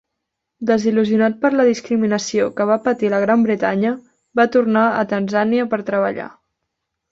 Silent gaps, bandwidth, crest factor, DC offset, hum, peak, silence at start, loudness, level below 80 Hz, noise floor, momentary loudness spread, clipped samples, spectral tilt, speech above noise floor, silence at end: none; 7.8 kHz; 14 dB; under 0.1%; none; -2 dBFS; 0.6 s; -18 LUFS; -62 dBFS; -78 dBFS; 7 LU; under 0.1%; -6 dB/octave; 62 dB; 0.8 s